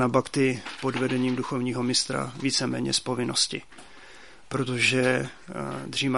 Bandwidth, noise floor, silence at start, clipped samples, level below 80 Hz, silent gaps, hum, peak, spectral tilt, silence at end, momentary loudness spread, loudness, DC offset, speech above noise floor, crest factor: 11.5 kHz; -50 dBFS; 0 s; under 0.1%; -60 dBFS; none; none; -6 dBFS; -4 dB/octave; 0 s; 11 LU; -26 LUFS; 0.3%; 23 dB; 20 dB